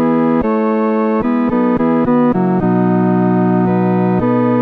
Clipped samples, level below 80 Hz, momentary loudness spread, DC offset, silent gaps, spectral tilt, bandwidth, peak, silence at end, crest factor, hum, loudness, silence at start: under 0.1%; -42 dBFS; 2 LU; 0.1%; none; -11 dB/octave; 4.6 kHz; -4 dBFS; 0 s; 10 dB; none; -14 LUFS; 0 s